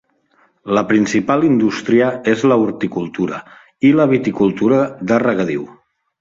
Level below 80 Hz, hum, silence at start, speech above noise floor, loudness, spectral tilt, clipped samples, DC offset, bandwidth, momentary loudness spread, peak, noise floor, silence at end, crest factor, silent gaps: -56 dBFS; none; 0.65 s; 42 dB; -16 LUFS; -6.5 dB/octave; under 0.1%; under 0.1%; 7.8 kHz; 9 LU; -2 dBFS; -57 dBFS; 0.5 s; 14 dB; none